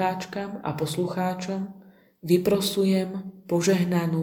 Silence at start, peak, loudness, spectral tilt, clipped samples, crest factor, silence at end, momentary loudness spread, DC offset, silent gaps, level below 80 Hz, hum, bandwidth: 0 s; -8 dBFS; -25 LUFS; -5.5 dB/octave; under 0.1%; 18 dB; 0 s; 11 LU; under 0.1%; none; -62 dBFS; none; 19 kHz